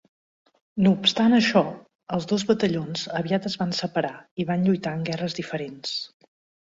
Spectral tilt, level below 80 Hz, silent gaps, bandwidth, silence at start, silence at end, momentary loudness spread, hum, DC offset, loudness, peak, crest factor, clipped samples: -5.5 dB/octave; -62 dBFS; 1.95-1.99 s, 4.31-4.37 s; 7.8 kHz; 0.75 s; 0.6 s; 12 LU; none; under 0.1%; -24 LUFS; -6 dBFS; 20 dB; under 0.1%